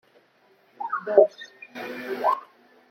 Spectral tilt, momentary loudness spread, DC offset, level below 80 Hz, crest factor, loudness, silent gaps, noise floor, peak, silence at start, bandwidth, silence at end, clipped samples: -5 dB/octave; 19 LU; under 0.1%; -82 dBFS; 24 dB; -24 LUFS; none; -61 dBFS; -2 dBFS; 0.8 s; 15.5 kHz; 0.45 s; under 0.1%